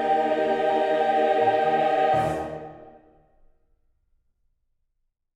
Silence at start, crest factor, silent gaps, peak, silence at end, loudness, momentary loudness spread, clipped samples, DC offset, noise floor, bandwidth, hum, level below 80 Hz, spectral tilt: 0 s; 16 dB; none; -10 dBFS; 2.45 s; -22 LUFS; 12 LU; under 0.1%; under 0.1%; -75 dBFS; 11 kHz; none; -58 dBFS; -6 dB/octave